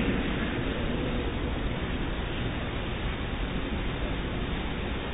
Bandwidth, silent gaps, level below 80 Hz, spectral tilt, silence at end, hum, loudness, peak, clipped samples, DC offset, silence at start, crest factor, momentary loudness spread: 4 kHz; none; -34 dBFS; -10.5 dB/octave; 0 s; none; -32 LUFS; -16 dBFS; under 0.1%; under 0.1%; 0 s; 14 dB; 3 LU